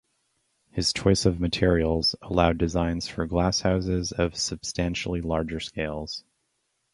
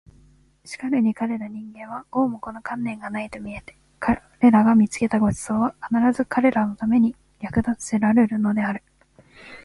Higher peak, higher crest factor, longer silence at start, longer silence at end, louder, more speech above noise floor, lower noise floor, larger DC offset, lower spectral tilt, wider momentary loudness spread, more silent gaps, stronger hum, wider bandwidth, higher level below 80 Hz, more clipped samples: about the same, -4 dBFS vs -4 dBFS; about the same, 22 dB vs 18 dB; about the same, 0.75 s vs 0.65 s; first, 0.75 s vs 0.05 s; second, -26 LUFS vs -22 LUFS; first, 50 dB vs 34 dB; first, -75 dBFS vs -55 dBFS; neither; second, -5 dB/octave vs -6.5 dB/octave; second, 9 LU vs 17 LU; neither; neither; about the same, 11.5 kHz vs 11.5 kHz; first, -38 dBFS vs -50 dBFS; neither